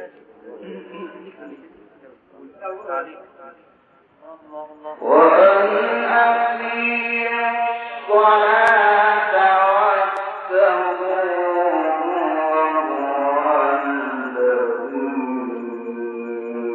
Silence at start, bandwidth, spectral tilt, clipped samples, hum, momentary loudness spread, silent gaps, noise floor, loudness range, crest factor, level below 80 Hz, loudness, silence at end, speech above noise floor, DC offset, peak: 0 s; 5 kHz; -5.5 dB/octave; under 0.1%; none; 21 LU; none; -53 dBFS; 19 LU; 18 dB; -76 dBFS; -18 LUFS; 0 s; 36 dB; under 0.1%; -2 dBFS